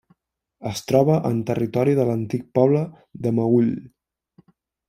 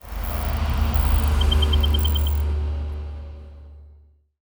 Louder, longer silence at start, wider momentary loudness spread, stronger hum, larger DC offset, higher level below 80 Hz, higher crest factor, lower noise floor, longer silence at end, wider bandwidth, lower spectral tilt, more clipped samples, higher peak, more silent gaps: about the same, -21 LUFS vs -23 LUFS; first, 0.6 s vs 0.05 s; second, 12 LU vs 17 LU; neither; neither; second, -60 dBFS vs -22 dBFS; first, 20 dB vs 14 dB; first, -66 dBFS vs -52 dBFS; first, 1 s vs 0.6 s; second, 16 kHz vs over 20 kHz; first, -8 dB/octave vs -5.5 dB/octave; neither; first, -2 dBFS vs -8 dBFS; neither